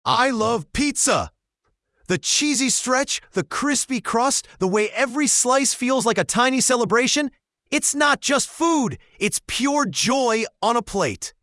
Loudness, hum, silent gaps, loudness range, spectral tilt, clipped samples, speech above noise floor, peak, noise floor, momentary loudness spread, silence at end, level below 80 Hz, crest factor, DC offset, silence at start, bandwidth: -20 LUFS; none; none; 2 LU; -2.5 dB/octave; under 0.1%; 52 dB; -4 dBFS; -73 dBFS; 7 LU; 0.15 s; -50 dBFS; 18 dB; under 0.1%; 0.05 s; 12 kHz